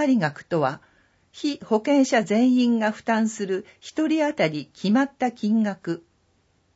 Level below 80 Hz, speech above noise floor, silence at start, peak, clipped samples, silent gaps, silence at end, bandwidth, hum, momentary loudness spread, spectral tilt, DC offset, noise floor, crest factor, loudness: -70 dBFS; 43 dB; 0 s; -8 dBFS; under 0.1%; none; 0.75 s; 8 kHz; none; 11 LU; -5.5 dB/octave; under 0.1%; -65 dBFS; 14 dB; -23 LUFS